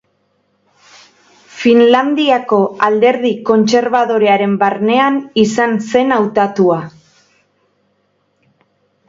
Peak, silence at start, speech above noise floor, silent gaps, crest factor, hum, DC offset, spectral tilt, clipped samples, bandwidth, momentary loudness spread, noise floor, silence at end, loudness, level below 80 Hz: 0 dBFS; 1.55 s; 49 dB; none; 14 dB; none; under 0.1%; -5.5 dB/octave; under 0.1%; 7.8 kHz; 4 LU; -61 dBFS; 2.2 s; -12 LUFS; -58 dBFS